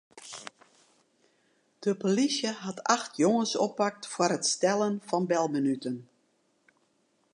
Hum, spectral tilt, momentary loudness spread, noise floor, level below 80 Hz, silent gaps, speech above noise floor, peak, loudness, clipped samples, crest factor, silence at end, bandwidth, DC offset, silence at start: none; -4 dB/octave; 15 LU; -71 dBFS; -82 dBFS; none; 43 dB; -6 dBFS; -28 LUFS; under 0.1%; 24 dB; 1.3 s; 11 kHz; under 0.1%; 0.15 s